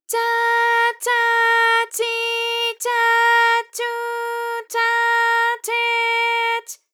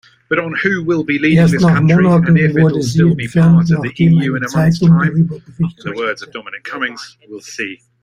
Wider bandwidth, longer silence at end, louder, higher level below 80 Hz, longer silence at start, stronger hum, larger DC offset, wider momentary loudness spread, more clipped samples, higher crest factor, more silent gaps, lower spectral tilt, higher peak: first, 19.5 kHz vs 9.8 kHz; about the same, 0.2 s vs 0.3 s; second, -18 LUFS vs -13 LUFS; second, under -90 dBFS vs -46 dBFS; second, 0.1 s vs 0.3 s; neither; neither; second, 10 LU vs 15 LU; neither; about the same, 12 dB vs 12 dB; neither; second, 5 dB/octave vs -7.5 dB/octave; second, -6 dBFS vs 0 dBFS